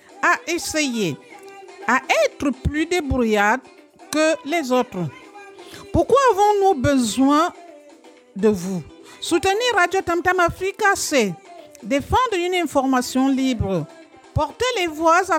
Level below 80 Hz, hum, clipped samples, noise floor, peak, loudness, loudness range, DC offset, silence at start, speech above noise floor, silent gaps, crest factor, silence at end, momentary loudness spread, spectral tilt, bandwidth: -42 dBFS; none; under 0.1%; -47 dBFS; -4 dBFS; -20 LUFS; 2 LU; under 0.1%; 0.15 s; 28 dB; none; 18 dB; 0 s; 12 LU; -4.5 dB/octave; 17 kHz